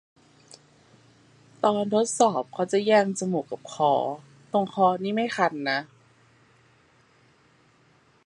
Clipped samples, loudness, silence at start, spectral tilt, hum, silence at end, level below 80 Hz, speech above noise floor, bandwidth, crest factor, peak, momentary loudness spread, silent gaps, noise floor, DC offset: under 0.1%; -25 LUFS; 1.65 s; -4.5 dB/octave; none; 2.4 s; -76 dBFS; 37 dB; 11.5 kHz; 22 dB; -4 dBFS; 8 LU; none; -61 dBFS; under 0.1%